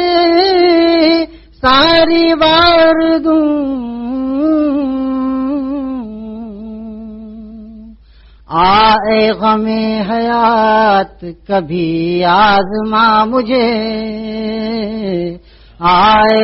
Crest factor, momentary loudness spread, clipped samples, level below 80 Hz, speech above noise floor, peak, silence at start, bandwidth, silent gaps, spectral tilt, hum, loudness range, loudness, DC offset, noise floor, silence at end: 12 dB; 18 LU; under 0.1%; -38 dBFS; 30 dB; 0 dBFS; 0 s; 6 kHz; none; -7.5 dB/octave; none; 8 LU; -12 LUFS; under 0.1%; -41 dBFS; 0 s